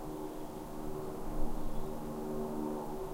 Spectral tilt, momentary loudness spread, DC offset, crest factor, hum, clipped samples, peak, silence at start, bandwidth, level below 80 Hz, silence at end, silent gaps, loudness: -6.5 dB/octave; 5 LU; under 0.1%; 16 dB; none; under 0.1%; -20 dBFS; 0 s; 16 kHz; -42 dBFS; 0 s; none; -41 LUFS